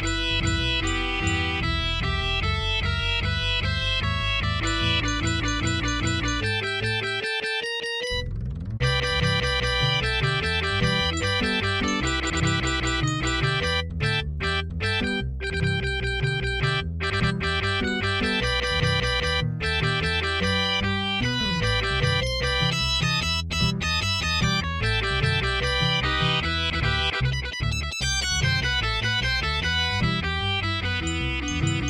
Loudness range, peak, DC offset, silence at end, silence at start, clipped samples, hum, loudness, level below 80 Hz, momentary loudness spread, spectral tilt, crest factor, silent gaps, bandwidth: 2 LU; -10 dBFS; under 0.1%; 0 s; 0 s; under 0.1%; none; -24 LUFS; -34 dBFS; 4 LU; -4 dB/octave; 14 dB; none; 14 kHz